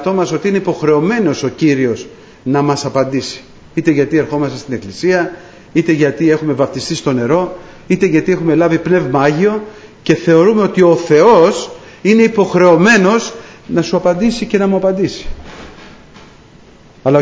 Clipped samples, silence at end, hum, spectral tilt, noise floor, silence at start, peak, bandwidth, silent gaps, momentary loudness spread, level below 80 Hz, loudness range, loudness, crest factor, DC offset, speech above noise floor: under 0.1%; 0 s; none; -6 dB/octave; -41 dBFS; 0 s; 0 dBFS; 8 kHz; none; 15 LU; -44 dBFS; 6 LU; -13 LUFS; 12 dB; under 0.1%; 29 dB